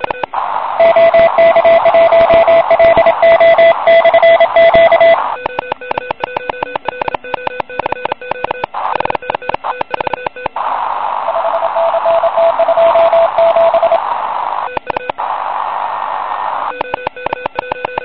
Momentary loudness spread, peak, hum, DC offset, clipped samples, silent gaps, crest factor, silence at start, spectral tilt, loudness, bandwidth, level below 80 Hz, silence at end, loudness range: 13 LU; 0 dBFS; none; 0.9%; under 0.1%; none; 10 dB; 0 s; -9 dB/octave; -12 LUFS; 5.2 kHz; -44 dBFS; 0 s; 12 LU